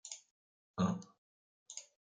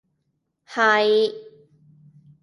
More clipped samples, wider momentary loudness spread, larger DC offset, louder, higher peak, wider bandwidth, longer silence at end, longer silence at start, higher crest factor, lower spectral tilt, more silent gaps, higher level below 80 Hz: neither; about the same, 14 LU vs 16 LU; neither; second, -42 LUFS vs -20 LUFS; second, -22 dBFS vs -4 dBFS; second, 9.4 kHz vs 11 kHz; second, 0.35 s vs 1 s; second, 0.05 s vs 0.7 s; about the same, 20 dB vs 20 dB; first, -5.5 dB/octave vs -3.5 dB/octave; first, 0.31-0.74 s, 1.18-1.66 s vs none; about the same, -80 dBFS vs -78 dBFS